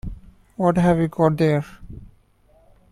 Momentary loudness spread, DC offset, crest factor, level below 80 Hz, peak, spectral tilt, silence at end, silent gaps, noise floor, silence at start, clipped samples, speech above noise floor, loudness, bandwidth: 22 LU; under 0.1%; 18 dB; -42 dBFS; -4 dBFS; -8.5 dB/octave; 0.85 s; none; -56 dBFS; 0.05 s; under 0.1%; 37 dB; -20 LUFS; 12.5 kHz